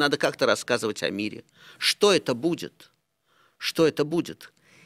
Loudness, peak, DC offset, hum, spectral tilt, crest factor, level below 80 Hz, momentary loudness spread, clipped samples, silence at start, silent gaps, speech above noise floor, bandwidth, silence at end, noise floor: -25 LUFS; -6 dBFS; under 0.1%; none; -3.5 dB/octave; 20 dB; -68 dBFS; 14 LU; under 0.1%; 0 s; none; 42 dB; 16 kHz; 0.4 s; -67 dBFS